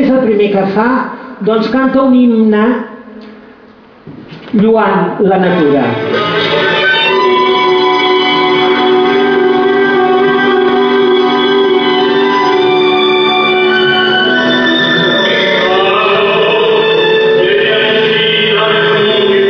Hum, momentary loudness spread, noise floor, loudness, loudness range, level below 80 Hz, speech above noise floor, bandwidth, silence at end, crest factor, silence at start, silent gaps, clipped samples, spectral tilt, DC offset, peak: none; 3 LU; -38 dBFS; -9 LUFS; 4 LU; -50 dBFS; 29 dB; 5.4 kHz; 0 s; 10 dB; 0 s; none; under 0.1%; -6 dB/octave; under 0.1%; 0 dBFS